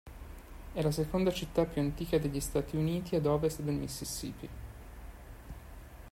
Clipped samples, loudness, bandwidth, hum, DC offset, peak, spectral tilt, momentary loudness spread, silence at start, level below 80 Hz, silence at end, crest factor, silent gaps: under 0.1%; -33 LUFS; 16 kHz; none; under 0.1%; -14 dBFS; -6 dB/octave; 19 LU; 0.05 s; -48 dBFS; 0 s; 20 dB; none